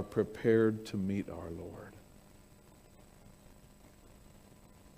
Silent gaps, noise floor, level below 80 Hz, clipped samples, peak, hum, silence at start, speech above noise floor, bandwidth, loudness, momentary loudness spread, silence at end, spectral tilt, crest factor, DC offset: none; -59 dBFS; -62 dBFS; under 0.1%; -16 dBFS; none; 0 s; 26 dB; 15.5 kHz; -33 LUFS; 23 LU; 0.1 s; -7.5 dB/octave; 22 dB; under 0.1%